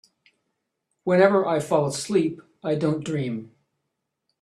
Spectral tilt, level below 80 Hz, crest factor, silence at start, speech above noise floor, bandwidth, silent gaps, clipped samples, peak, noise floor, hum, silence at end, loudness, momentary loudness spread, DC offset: -6 dB/octave; -66 dBFS; 22 dB; 1.05 s; 57 dB; 13 kHz; none; under 0.1%; -4 dBFS; -80 dBFS; none; 0.95 s; -23 LUFS; 14 LU; under 0.1%